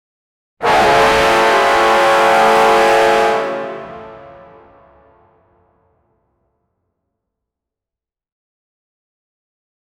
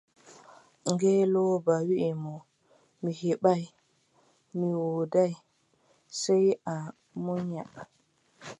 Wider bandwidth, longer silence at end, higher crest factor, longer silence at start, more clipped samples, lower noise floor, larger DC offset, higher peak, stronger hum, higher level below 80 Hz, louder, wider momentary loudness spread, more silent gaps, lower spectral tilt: first, 18.5 kHz vs 11 kHz; first, 5.8 s vs 0.05 s; second, 14 dB vs 20 dB; first, 0.6 s vs 0.3 s; neither; first, -88 dBFS vs -68 dBFS; neither; first, -2 dBFS vs -10 dBFS; neither; first, -44 dBFS vs -76 dBFS; first, -12 LUFS vs -29 LUFS; second, 15 LU vs 20 LU; neither; second, -3 dB/octave vs -6.5 dB/octave